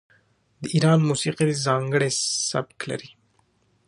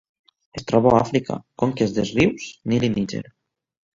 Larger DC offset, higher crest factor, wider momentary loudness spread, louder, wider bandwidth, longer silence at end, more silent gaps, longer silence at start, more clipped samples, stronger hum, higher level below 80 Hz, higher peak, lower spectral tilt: neither; about the same, 20 dB vs 20 dB; about the same, 13 LU vs 15 LU; about the same, -23 LUFS vs -21 LUFS; first, 11.5 kHz vs 7.8 kHz; about the same, 0.8 s vs 0.75 s; neither; about the same, 0.6 s vs 0.55 s; neither; neither; second, -64 dBFS vs -50 dBFS; second, -6 dBFS vs -2 dBFS; second, -4.5 dB/octave vs -6.5 dB/octave